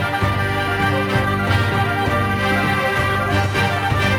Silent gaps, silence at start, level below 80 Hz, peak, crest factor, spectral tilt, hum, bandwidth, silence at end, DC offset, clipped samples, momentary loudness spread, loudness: none; 0 s; -32 dBFS; -6 dBFS; 12 dB; -5.5 dB/octave; none; 16 kHz; 0 s; under 0.1%; under 0.1%; 2 LU; -18 LUFS